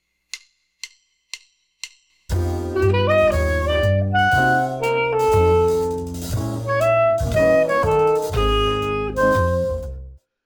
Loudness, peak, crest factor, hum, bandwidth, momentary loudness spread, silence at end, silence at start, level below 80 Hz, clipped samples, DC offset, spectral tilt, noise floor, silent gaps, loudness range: -19 LUFS; -6 dBFS; 14 dB; none; 19 kHz; 20 LU; 0.3 s; 0.35 s; -32 dBFS; under 0.1%; under 0.1%; -6 dB/octave; -41 dBFS; none; 4 LU